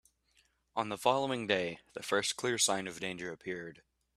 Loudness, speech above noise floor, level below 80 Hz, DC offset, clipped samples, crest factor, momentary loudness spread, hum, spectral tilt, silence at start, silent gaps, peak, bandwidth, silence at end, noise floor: -34 LUFS; 38 dB; -72 dBFS; under 0.1%; under 0.1%; 22 dB; 12 LU; none; -2.5 dB/octave; 0.75 s; none; -14 dBFS; 15 kHz; 0.45 s; -72 dBFS